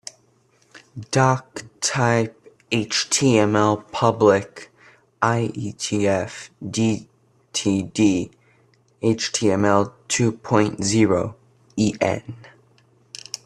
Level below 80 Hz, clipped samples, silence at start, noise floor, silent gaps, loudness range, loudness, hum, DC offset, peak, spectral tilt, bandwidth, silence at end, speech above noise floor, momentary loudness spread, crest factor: -58 dBFS; under 0.1%; 0.75 s; -60 dBFS; none; 4 LU; -21 LUFS; none; under 0.1%; -2 dBFS; -4.5 dB/octave; 12.5 kHz; 1.1 s; 40 dB; 17 LU; 20 dB